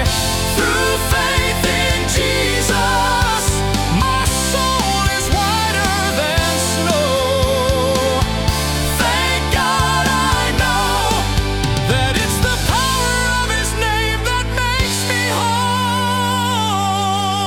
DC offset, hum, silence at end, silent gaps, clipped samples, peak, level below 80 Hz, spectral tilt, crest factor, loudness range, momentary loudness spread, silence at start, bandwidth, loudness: under 0.1%; none; 0 s; none; under 0.1%; -4 dBFS; -26 dBFS; -3.5 dB/octave; 12 dB; 1 LU; 2 LU; 0 s; 18 kHz; -16 LUFS